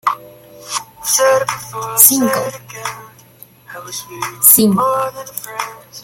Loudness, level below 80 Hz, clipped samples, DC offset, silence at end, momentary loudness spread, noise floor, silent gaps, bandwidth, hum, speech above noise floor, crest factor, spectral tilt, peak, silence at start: -12 LUFS; -58 dBFS; 0.2%; under 0.1%; 0 s; 19 LU; -43 dBFS; none; 17 kHz; none; 28 dB; 16 dB; -2.5 dB/octave; 0 dBFS; 0.05 s